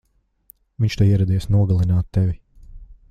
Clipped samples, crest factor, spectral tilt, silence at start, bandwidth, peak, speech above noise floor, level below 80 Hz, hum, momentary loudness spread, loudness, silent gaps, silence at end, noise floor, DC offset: under 0.1%; 16 dB; -8 dB/octave; 0.8 s; 7.4 kHz; -4 dBFS; 37 dB; -38 dBFS; none; 7 LU; -19 LUFS; none; 0.15 s; -54 dBFS; under 0.1%